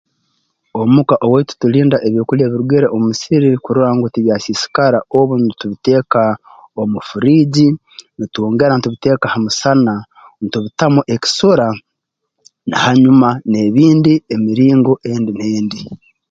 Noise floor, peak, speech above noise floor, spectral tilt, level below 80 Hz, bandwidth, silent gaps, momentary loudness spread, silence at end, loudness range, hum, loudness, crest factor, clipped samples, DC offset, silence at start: -75 dBFS; 0 dBFS; 62 dB; -6.5 dB/octave; -52 dBFS; 7.8 kHz; none; 11 LU; 0.35 s; 3 LU; none; -13 LUFS; 14 dB; under 0.1%; under 0.1%; 0.75 s